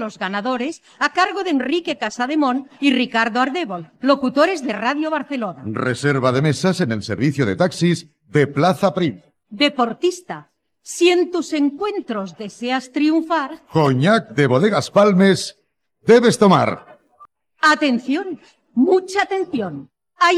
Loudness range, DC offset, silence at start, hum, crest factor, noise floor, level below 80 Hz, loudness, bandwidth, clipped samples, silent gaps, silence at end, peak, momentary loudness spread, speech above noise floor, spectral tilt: 4 LU; under 0.1%; 0 s; none; 16 dB; -50 dBFS; -62 dBFS; -18 LUFS; 13.5 kHz; under 0.1%; none; 0 s; -2 dBFS; 11 LU; 32 dB; -5.5 dB/octave